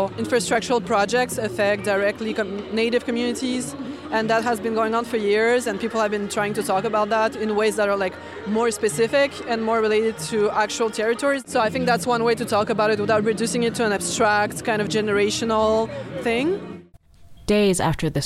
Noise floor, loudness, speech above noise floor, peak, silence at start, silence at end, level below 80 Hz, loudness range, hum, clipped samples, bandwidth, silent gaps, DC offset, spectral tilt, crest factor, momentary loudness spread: -48 dBFS; -22 LUFS; 27 dB; -8 dBFS; 0 s; 0 s; -50 dBFS; 2 LU; none; under 0.1%; 15 kHz; none; under 0.1%; -4 dB/octave; 14 dB; 6 LU